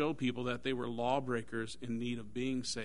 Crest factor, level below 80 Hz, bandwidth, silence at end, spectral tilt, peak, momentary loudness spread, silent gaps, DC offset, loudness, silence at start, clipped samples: 18 dB; -64 dBFS; 10.5 kHz; 0 s; -5 dB/octave; -18 dBFS; 6 LU; none; 0.5%; -37 LUFS; 0 s; under 0.1%